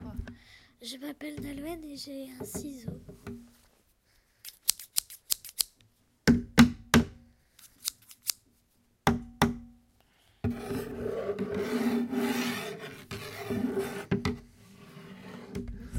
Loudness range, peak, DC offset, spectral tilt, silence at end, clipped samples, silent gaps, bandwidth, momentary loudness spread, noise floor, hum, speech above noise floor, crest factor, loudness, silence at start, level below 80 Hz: 13 LU; 0 dBFS; under 0.1%; -4 dB/octave; 0 s; under 0.1%; none; 16.5 kHz; 19 LU; -69 dBFS; none; 29 dB; 32 dB; -31 LUFS; 0 s; -50 dBFS